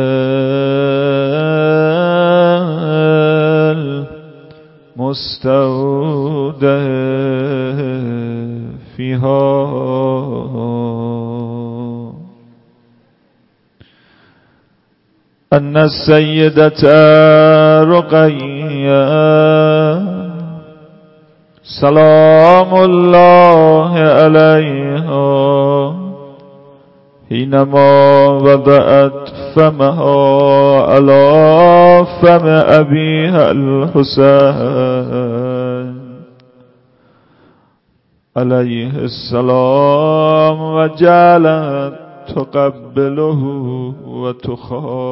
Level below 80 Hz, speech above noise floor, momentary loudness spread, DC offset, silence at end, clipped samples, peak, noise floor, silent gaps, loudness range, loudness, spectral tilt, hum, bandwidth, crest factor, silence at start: -48 dBFS; 49 dB; 16 LU; under 0.1%; 0 s; 0.1%; 0 dBFS; -57 dBFS; none; 12 LU; -10 LUFS; -10 dB/octave; none; 5.8 kHz; 10 dB; 0 s